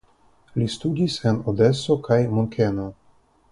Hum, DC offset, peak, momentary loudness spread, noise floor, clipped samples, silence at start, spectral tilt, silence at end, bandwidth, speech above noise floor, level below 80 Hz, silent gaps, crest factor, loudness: none; under 0.1%; -4 dBFS; 9 LU; -58 dBFS; under 0.1%; 0.55 s; -7 dB/octave; 0.6 s; 11.5 kHz; 37 dB; -50 dBFS; none; 18 dB; -22 LUFS